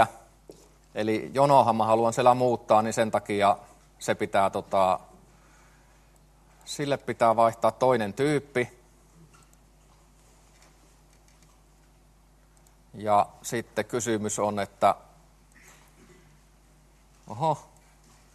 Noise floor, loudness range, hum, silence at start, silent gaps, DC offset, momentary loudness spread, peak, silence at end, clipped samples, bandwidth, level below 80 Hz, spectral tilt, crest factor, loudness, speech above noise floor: -58 dBFS; 10 LU; none; 0 s; none; under 0.1%; 12 LU; -4 dBFS; 0.75 s; under 0.1%; 13 kHz; -60 dBFS; -5 dB/octave; 24 dB; -25 LUFS; 34 dB